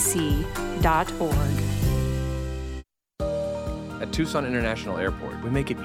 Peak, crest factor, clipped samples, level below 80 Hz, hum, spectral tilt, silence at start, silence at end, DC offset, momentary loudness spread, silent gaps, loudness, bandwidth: -8 dBFS; 18 dB; under 0.1%; -34 dBFS; none; -5 dB/octave; 0 s; 0 s; under 0.1%; 10 LU; none; -26 LUFS; 17 kHz